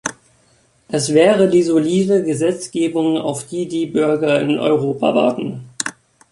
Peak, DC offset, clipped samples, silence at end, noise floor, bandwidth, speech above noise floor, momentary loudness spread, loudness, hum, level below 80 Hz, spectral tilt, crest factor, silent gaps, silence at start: 0 dBFS; under 0.1%; under 0.1%; 0.4 s; -56 dBFS; 11.5 kHz; 40 dB; 12 LU; -17 LUFS; none; -60 dBFS; -5 dB/octave; 18 dB; none; 0.05 s